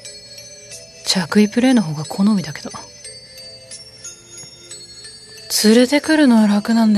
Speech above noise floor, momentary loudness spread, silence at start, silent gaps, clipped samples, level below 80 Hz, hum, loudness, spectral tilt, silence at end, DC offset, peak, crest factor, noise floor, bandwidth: 24 dB; 22 LU; 0.05 s; none; under 0.1%; -58 dBFS; none; -15 LUFS; -4.5 dB/octave; 0 s; under 0.1%; 0 dBFS; 18 dB; -39 dBFS; 14 kHz